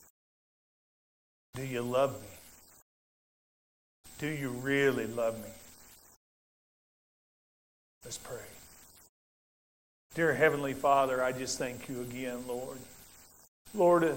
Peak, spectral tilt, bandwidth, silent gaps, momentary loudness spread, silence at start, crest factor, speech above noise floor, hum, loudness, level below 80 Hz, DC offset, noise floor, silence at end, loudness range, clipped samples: -12 dBFS; -5 dB/octave; 16.5 kHz; 2.82-4.04 s, 6.16-8.01 s, 9.09-10.10 s, 13.48-13.65 s; 24 LU; 1.55 s; 22 dB; 25 dB; none; -32 LUFS; -66 dBFS; under 0.1%; -56 dBFS; 0 s; 18 LU; under 0.1%